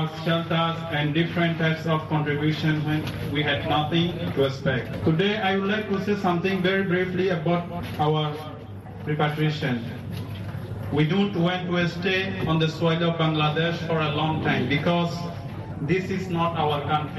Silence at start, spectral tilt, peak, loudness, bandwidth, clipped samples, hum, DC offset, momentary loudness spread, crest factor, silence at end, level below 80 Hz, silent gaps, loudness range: 0 s; -7 dB/octave; -8 dBFS; -24 LUFS; 12.5 kHz; under 0.1%; none; under 0.1%; 10 LU; 16 dB; 0 s; -50 dBFS; none; 3 LU